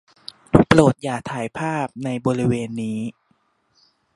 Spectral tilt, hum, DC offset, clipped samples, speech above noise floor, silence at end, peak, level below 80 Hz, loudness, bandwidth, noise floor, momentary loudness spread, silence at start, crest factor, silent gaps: -6.5 dB/octave; none; under 0.1%; under 0.1%; 44 dB; 1.05 s; 0 dBFS; -46 dBFS; -20 LUFS; 11.5 kHz; -65 dBFS; 15 LU; 0.55 s; 22 dB; none